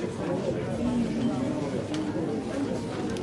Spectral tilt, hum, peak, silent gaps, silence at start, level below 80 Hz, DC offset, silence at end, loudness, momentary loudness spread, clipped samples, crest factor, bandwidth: -6.5 dB/octave; none; -16 dBFS; none; 0 s; -52 dBFS; under 0.1%; 0 s; -30 LUFS; 3 LU; under 0.1%; 14 dB; 11.5 kHz